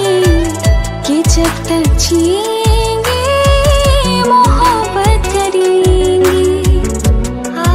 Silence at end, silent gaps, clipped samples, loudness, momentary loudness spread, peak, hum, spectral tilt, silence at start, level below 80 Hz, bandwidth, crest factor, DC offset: 0 s; none; under 0.1%; -11 LUFS; 4 LU; 0 dBFS; none; -5 dB/octave; 0 s; -16 dBFS; 16.5 kHz; 10 dB; under 0.1%